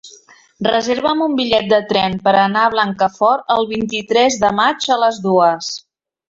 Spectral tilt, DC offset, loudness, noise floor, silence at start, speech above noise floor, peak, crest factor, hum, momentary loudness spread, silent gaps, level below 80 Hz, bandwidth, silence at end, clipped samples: -4 dB/octave; under 0.1%; -15 LUFS; -46 dBFS; 0.05 s; 31 dB; 0 dBFS; 16 dB; none; 5 LU; none; -54 dBFS; 7.8 kHz; 0.5 s; under 0.1%